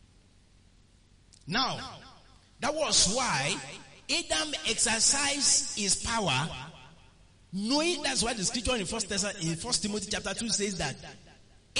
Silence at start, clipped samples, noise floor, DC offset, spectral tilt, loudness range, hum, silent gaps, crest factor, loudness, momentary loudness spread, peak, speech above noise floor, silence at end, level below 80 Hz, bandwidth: 1.45 s; under 0.1%; -60 dBFS; under 0.1%; -2 dB/octave; 5 LU; none; none; 20 dB; -28 LUFS; 14 LU; -12 dBFS; 31 dB; 0 s; -52 dBFS; 11 kHz